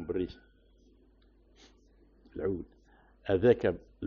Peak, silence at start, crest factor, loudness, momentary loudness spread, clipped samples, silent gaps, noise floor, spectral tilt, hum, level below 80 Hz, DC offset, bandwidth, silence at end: -12 dBFS; 0 s; 24 dB; -31 LUFS; 19 LU; under 0.1%; none; -63 dBFS; -6.5 dB/octave; none; -56 dBFS; under 0.1%; 6.8 kHz; 0 s